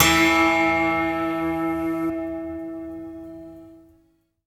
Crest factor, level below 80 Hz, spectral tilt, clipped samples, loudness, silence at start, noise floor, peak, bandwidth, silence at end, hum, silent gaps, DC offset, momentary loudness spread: 20 dB; -46 dBFS; -3.5 dB/octave; under 0.1%; -21 LUFS; 0 s; -63 dBFS; -2 dBFS; 16 kHz; 0.7 s; none; none; under 0.1%; 21 LU